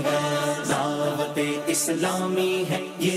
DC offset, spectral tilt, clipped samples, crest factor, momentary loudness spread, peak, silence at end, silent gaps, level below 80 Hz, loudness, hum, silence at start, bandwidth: under 0.1%; -4 dB/octave; under 0.1%; 12 dB; 2 LU; -12 dBFS; 0 s; none; -68 dBFS; -25 LUFS; none; 0 s; 16 kHz